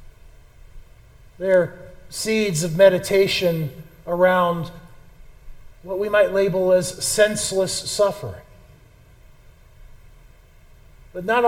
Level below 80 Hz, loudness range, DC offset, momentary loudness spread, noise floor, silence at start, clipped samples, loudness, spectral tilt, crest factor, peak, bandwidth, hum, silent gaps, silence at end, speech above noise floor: -48 dBFS; 7 LU; under 0.1%; 17 LU; -49 dBFS; 0 s; under 0.1%; -20 LUFS; -4 dB/octave; 20 dB; -2 dBFS; 16.5 kHz; none; none; 0 s; 30 dB